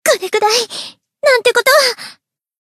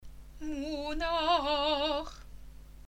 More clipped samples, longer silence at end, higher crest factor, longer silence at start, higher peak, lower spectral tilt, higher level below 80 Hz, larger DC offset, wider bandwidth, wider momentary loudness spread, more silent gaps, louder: neither; first, 0.5 s vs 0.05 s; about the same, 14 dB vs 18 dB; about the same, 0.05 s vs 0 s; first, 0 dBFS vs -16 dBFS; second, 0.5 dB/octave vs -4 dB/octave; second, -68 dBFS vs -48 dBFS; neither; second, 14 kHz vs 16.5 kHz; about the same, 17 LU vs 17 LU; neither; first, -13 LUFS vs -31 LUFS